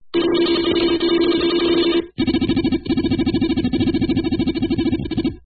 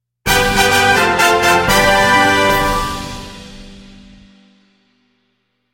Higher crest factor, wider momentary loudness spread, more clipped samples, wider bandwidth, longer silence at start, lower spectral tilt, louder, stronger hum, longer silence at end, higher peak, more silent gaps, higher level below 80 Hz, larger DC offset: about the same, 12 dB vs 16 dB; second, 4 LU vs 17 LU; neither; second, 4.9 kHz vs 16.5 kHz; second, 0.05 s vs 0.25 s; first, -11.5 dB/octave vs -3 dB/octave; second, -19 LUFS vs -12 LUFS; neither; second, 0.05 s vs 1.9 s; second, -6 dBFS vs 0 dBFS; neither; second, -38 dBFS vs -32 dBFS; neither